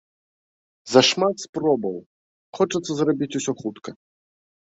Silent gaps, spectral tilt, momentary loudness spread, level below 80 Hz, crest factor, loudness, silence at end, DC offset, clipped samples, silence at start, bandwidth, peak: 1.49-1.53 s, 2.06-2.53 s; -4 dB/octave; 16 LU; -66 dBFS; 22 dB; -22 LUFS; 0.8 s; under 0.1%; under 0.1%; 0.85 s; 8.2 kHz; -2 dBFS